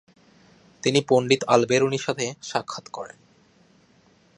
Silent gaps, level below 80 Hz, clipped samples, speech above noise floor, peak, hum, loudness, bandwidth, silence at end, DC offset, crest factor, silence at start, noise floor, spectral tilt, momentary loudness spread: none; -68 dBFS; under 0.1%; 36 dB; -2 dBFS; none; -23 LUFS; 11 kHz; 1.3 s; under 0.1%; 22 dB; 0.85 s; -59 dBFS; -4.5 dB/octave; 17 LU